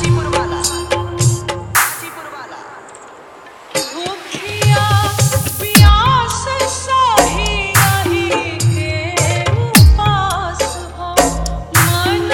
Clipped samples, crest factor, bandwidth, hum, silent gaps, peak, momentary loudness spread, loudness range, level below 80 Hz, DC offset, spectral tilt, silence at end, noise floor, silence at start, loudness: under 0.1%; 14 dB; over 20 kHz; none; none; 0 dBFS; 14 LU; 7 LU; -24 dBFS; under 0.1%; -4 dB/octave; 0 s; -37 dBFS; 0 s; -14 LUFS